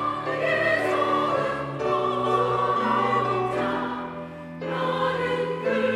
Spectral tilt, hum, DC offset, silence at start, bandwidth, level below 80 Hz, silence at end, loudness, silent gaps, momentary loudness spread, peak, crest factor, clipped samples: -6 dB/octave; none; under 0.1%; 0 s; 13 kHz; -58 dBFS; 0 s; -24 LUFS; none; 9 LU; -10 dBFS; 14 dB; under 0.1%